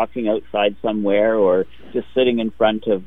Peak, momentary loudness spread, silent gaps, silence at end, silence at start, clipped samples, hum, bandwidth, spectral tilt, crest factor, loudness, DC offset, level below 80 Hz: -2 dBFS; 7 LU; none; 0 s; 0 s; under 0.1%; none; 3.9 kHz; -8.5 dB/octave; 16 dB; -19 LUFS; 2%; -50 dBFS